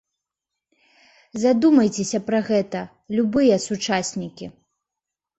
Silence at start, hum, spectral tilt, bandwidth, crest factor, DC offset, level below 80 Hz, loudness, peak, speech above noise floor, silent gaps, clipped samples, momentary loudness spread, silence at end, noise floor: 1.35 s; none; -5 dB/octave; 8.2 kHz; 18 dB; under 0.1%; -60 dBFS; -21 LUFS; -6 dBFS; 66 dB; none; under 0.1%; 17 LU; 0.85 s; -86 dBFS